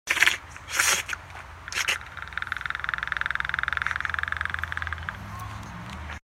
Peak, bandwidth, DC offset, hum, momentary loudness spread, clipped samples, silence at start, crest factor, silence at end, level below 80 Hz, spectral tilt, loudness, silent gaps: -2 dBFS; 16.5 kHz; under 0.1%; none; 16 LU; under 0.1%; 0.05 s; 28 dB; 0.05 s; -46 dBFS; -0.5 dB/octave; -27 LUFS; none